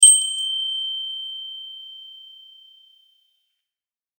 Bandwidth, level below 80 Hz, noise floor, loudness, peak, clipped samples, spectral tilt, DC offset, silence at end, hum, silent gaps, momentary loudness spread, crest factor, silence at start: over 20 kHz; under -90 dBFS; under -90 dBFS; -20 LUFS; 0 dBFS; under 0.1%; 13.5 dB/octave; under 0.1%; 2.05 s; none; none; 23 LU; 24 dB; 0 s